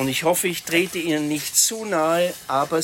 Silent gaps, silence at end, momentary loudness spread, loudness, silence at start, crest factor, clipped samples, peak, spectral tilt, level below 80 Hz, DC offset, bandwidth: none; 0 s; 5 LU; -21 LUFS; 0 s; 18 dB; under 0.1%; -4 dBFS; -2.5 dB/octave; -60 dBFS; under 0.1%; 16.5 kHz